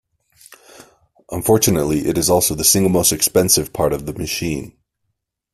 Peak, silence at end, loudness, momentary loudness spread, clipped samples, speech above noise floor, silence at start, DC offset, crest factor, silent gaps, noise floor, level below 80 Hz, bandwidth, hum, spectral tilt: 0 dBFS; 0.85 s; -16 LUFS; 11 LU; under 0.1%; 57 dB; 1.3 s; under 0.1%; 18 dB; none; -74 dBFS; -42 dBFS; 16 kHz; none; -3.5 dB/octave